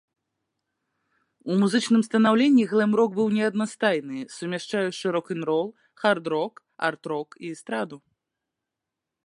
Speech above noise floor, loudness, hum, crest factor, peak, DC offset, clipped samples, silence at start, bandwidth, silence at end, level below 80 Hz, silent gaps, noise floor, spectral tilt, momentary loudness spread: 62 dB; -24 LUFS; none; 18 dB; -6 dBFS; under 0.1%; under 0.1%; 1.45 s; 11 kHz; 1.3 s; -76 dBFS; none; -86 dBFS; -5.5 dB/octave; 14 LU